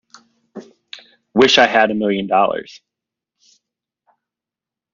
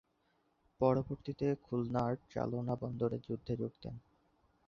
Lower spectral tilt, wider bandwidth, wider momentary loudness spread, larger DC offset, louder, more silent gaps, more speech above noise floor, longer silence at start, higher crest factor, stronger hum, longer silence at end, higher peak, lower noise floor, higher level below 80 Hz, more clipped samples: second, -1.5 dB/octave vs -8.5 dB/octave; about the same, 7.4 kHz vs 7 kHz; first, 27 LU vs 10 LU; neither; first, -15 LUFS vs -37 LUFS; neither; first, 72 dB vs 40 dB; second, 0.55 s vs 0.8 s; about the same, 20 dB vs 22 dB; neither; first, 2.2 s vs 0.7 s; first, 0 dBFS vs -16 dBFS; first, -87 dBFS vs -77 dBFS; about the same, -60 dBFS vs -62 dBFS; neither